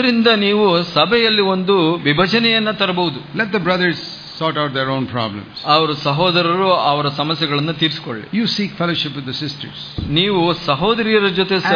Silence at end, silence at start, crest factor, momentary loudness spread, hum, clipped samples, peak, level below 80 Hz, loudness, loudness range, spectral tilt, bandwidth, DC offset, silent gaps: 0 s; 0 s; 16 dB; 10 LU; none; under 0.1%; 0 dBFS; -46 dBFS; -16 LUFS; 4 LU; -6.5 dB/octave; 5.4 kHz; under 0.1%; none